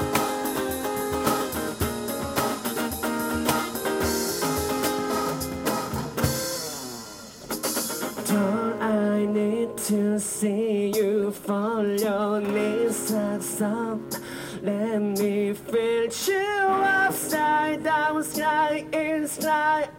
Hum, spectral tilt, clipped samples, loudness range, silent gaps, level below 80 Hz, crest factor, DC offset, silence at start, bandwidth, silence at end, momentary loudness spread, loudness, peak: none; -4 dB/octave; under 0.1%; 4 LU; none; -50 dBFS; 20 dB; under 0.1%; 0 s; 17 kHz; 0 s; 6 LU; -25 LUFS; -4 dBFS